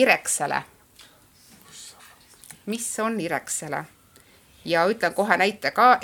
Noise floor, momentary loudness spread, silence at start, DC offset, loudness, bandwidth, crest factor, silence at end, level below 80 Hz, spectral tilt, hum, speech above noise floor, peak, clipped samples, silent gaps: -55 dBFS; 23 LU; 0 s; under 0.1%; -23 LUFS; 19.5 kHz; 24 dB; 0 s; -66 dBFS; -2.5 dB/octave; none; 32 dB; -2 dBFS; under 0.1%; none